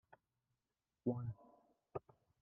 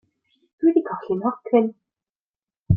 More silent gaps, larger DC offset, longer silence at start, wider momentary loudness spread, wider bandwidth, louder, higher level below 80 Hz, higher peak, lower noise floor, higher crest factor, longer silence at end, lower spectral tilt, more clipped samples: second, none vs 2.19-2.34 s, 2.57-2.64 s; neither; second, 0.1 s vs 0.6 s; first, 10 LU vs 7 LU; about the same, 3 kHz vs 3.3 kHz; second, -47 LUFS vs -22 LUFS; second, -76 dBFS vs -52 dBFS; second, -26 dBFS vs -4 dBFS; about the same, under -90 dBFS vs under -90 dBFS; about the same, 22 dB vs 18 dB; first, 0.4 s vs 0 s; second, -9.5 dB/octave vs -12.5 dB/octave; neither